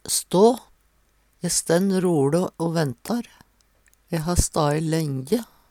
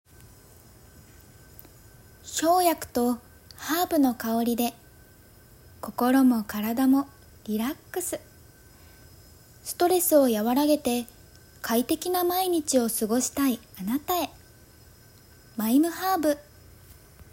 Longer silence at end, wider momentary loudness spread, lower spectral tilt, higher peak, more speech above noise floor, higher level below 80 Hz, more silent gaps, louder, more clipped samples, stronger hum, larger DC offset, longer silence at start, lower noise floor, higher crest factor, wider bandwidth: first, 0.25 s vs 0.1 s; second, 11 LU vs 15 LU; first, -5 dB/octave vs -3.5 dB/octave; first, -4 dBFS vs -8 dBFS; first, 41 dB vs 29 dB; first, -40 dBFS vs -58 dBFS; neither; first, -22 LUFS vs -25 LUFS; neither; neither; neither; second, 0.05 s vs 2.25 s; first, -63 dBFS vs -53 dBFS; about the same, 20 dB vs 18 dB; about the same, 18 kHz vs 16.5 kHz